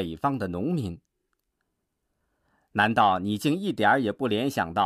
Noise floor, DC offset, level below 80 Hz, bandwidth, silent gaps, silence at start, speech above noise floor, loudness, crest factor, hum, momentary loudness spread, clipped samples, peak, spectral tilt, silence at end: -79 dBFS; under 0.1%; -58 dBFS; 15.5 kHz; none; 0 s; 54 dB; -25 LUFS; 20 dB; none; 9 LU; under 0.1%; -8 dBFS; -6 dB/octave; 0 s